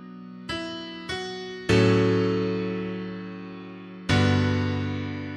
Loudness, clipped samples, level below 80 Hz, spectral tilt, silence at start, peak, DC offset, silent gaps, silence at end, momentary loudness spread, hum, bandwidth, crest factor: -26 LUFS; under 0.1%; -50 dBFS; -6.5 dB/octave; 0 s; -8 dBFS; under 0.1%; none; 0 s; 18 LU; none; 11 kHz; 18 dB